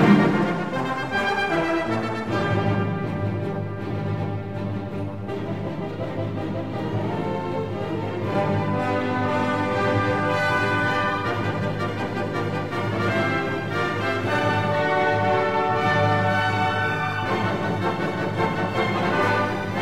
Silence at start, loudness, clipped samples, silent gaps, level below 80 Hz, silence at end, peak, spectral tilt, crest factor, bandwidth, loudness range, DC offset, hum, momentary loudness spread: 0 s; -24 LUFS; under 0.1%; none; -50 dBFS; 0 s; -4 dBFS; -7 dB/octave; 20 dB; 14 kHz; 7 LU; 0.6%; none; 8 LU